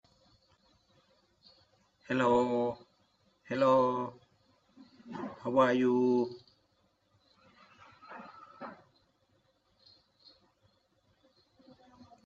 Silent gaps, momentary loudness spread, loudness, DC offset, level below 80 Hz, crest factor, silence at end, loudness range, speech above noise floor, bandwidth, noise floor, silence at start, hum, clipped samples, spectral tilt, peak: none; 23 LU; -30 LUFS; under 0.1%; -74 dBFS; 22 dB; 3.5 s; 23 LU; 45 dB; 8 kHz; -73 dBFS; 2.1 s; none; under 0.1%; -7 dB/octave; -12 dBFS